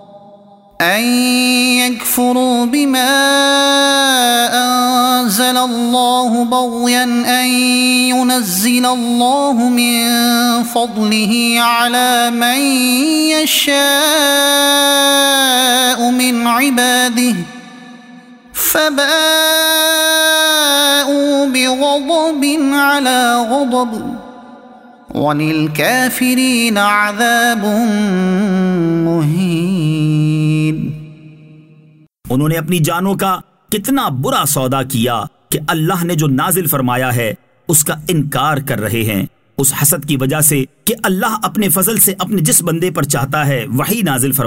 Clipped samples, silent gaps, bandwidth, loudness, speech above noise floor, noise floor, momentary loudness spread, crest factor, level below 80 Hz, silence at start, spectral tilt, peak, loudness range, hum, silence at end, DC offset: under 0.1%; none; 16.5 kHz; -12 LUFS; 33 dB; -46 dBFS; 7 LU; 14 dB; -48 dBFS; 0.15 s; -3.5 dB/octave; 0 dBFS; 5 LU; none; 0 s; under 0.1%